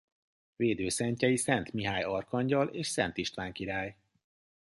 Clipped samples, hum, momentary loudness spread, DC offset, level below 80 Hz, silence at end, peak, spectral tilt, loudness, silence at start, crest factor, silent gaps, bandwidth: under 0.1%; none; 7 LU; under 0.1%; -60 dBFS; 0.8 s; -12 dBFS; -4.5 dB/octave; -32 LUFS; 0.6 s; 22 dB; none; 11.5 kHz